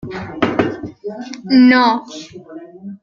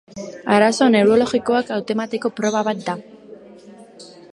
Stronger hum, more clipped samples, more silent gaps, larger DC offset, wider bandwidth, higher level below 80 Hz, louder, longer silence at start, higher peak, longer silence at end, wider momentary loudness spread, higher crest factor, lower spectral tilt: neither; neither; neither; neither; second, 7.2 kHz vs 11.5 kHz; first, -52 dBFS vs -60 dBFS; first, -14 LUFS vs -18 LUFS; about the same, 0.05 s vs 0.15 s; about the same, 0 dBFS vs -2 dBFS; second, 0.05 s vs 0.25 s; first, 24 LU vs 14 LU; about the same, 16 dB vs 18 dB; about the same, -5.5 dB/octave vs -5 dB/octave